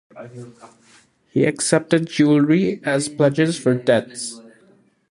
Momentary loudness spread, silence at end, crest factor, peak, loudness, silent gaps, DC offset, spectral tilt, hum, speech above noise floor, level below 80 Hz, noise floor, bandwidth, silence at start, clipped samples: 18 LU; 0.7 s; 18 dB; -2 dBFS; -19 LUFS; none; under 0.1%; -5.5 dB/octave; none; 36 dB; -62 dBFS; -55 dBFS; 11.5 kHz; 0.15 s; under 0.1%